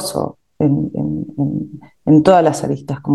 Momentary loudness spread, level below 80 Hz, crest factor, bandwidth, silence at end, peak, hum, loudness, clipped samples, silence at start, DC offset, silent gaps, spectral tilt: 14 LU; -48 dBFS; 16 dB; 12.5 kHz; 0 s; 0 dBFS; none; -16 LUFS; under 0.1%; 0 s; 0.2%; none; -7 dB/octave